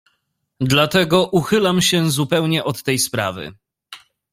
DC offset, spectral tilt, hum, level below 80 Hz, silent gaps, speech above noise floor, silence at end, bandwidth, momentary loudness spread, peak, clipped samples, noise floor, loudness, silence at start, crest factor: under 0.1%; -4.5 dB/octave; none; -52 dBFS; none; 53 dB; 0.35 s; 16.5 kHz; 10 LU; -2 dBFS; under 0.1%; -71 dBFS; -17 LUFS; 0.6 s; 18 dB